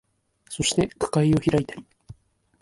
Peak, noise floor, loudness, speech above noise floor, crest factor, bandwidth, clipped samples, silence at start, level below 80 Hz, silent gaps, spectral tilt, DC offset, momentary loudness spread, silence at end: -8 dBFS; -54 dBFS; -23 LUFS; 32 dB; 18 dB; 11.5 kHz; under 0.1%; 0.5 s; -50 dBFS; none; -5 dB/octave; under 0.1%; 17 LU; 0.5 s